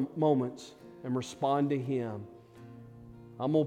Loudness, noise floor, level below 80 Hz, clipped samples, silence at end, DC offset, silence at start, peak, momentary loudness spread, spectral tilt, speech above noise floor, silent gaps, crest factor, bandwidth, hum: -32 LUFS; -51 dBFS; -70 dBFS; under 0.1%; 0 s; under 0.1%; 0 s; -14 dBFS; 23 LU; -7.5 dB/octave; 20 dB; none; 18 dB; 11.5 kHz; none